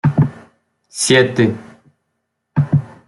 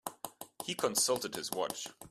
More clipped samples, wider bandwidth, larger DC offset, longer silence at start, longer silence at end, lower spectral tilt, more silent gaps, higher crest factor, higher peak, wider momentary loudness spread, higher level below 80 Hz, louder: neither; second, 12 kHz vs 15.5 kHz; neither; about the same, 0.05 s vs 0.05 s; first, 0.2 s vs 0 s; first, -5 dB/octave vs -1.5 dB/octave; neither; second, 16 dB vs 22 dB; first, -2 dBFS vs -14 dBFS; about the same, 13 LU vs 15 LU; first, -52 dBFS vs -76 dBFS; first, -16 LUFS vs -34 LUFS